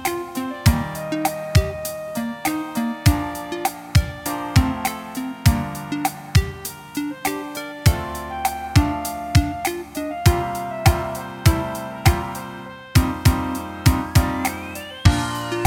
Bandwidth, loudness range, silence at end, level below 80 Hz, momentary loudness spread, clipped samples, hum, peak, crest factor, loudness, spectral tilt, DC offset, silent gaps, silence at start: 18 kHz; 2 LU; 0 s; -28 dBFS; 9 LU; under 0.1%; none; 0 dBFS; 20 dB; -22 LUFS; -5.5 dB/octave; under 0.1%; none; 0 s